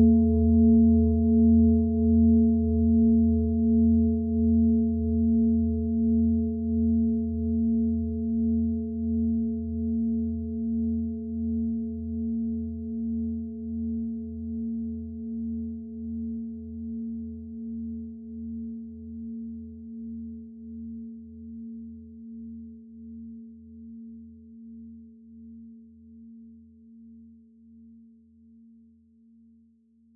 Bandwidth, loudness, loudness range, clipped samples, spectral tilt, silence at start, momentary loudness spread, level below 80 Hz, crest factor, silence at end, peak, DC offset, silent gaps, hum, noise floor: 0.7 kHz; -26 LUFS; 22 LU; under 0.1%; -17 dB/octave; 0 s; 23 LU; -42 dBFS; 16 dB; 2.9 s; -10 dBFS; under 0.1%; none; none; -61 dBFS